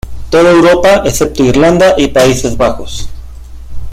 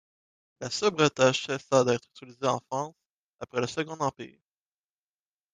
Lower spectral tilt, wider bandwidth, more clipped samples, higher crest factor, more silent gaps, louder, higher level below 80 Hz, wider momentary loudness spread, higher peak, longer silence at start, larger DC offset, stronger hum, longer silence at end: about the same, -5 dB/octave vs -4 dB/octave; first, 16 kHz vs 9.8 kHz; first, 0.2% vs under 0.1%; second, 8 dB vs 22 dB; second, none vs 3.09-3.38 s; first, -8 LUFS vs -28 LUFS; first, -26 dBFS vs -70 dBFS; about the same, 17 LU vs 16 LU; first, 0 dBFS vs -8 dBFS; second, 0.05 s vs 0.6 s; neither; neither; second, 0 s vs 1.25 s